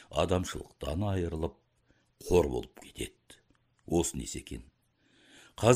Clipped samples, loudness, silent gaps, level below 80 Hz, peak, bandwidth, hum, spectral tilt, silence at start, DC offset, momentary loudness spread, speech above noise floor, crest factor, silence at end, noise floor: under 0.1%; -33 LUFS; none; -48 dBFS; -8 dBFS; 15.5 kHz; none; -5.5 dB/octave; 0 s; under 0.1%; 18 LU; 38 dB; 26 dB; 0 s; -70 dBFS